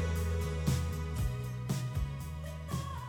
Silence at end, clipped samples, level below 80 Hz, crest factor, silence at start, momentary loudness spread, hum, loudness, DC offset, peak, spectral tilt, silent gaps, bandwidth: 0 s; under 0.1%; -40 dBFS; 16 dB; 0 s; 7 LU; none; -36 LUFS; under 0.1%; -18 dBFS; -6 dB/octave; none; 18.5 kHz